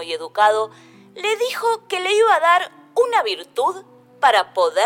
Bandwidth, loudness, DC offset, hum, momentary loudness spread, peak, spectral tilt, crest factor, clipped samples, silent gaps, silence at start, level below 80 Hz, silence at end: 17 kHz; -19 LUFS; under 0.1%; none; 9 LU; -4 dBFS; -1 dB/octave; 16 dB; under 0.1%; none; 0 s; -68 dBFS; 0 s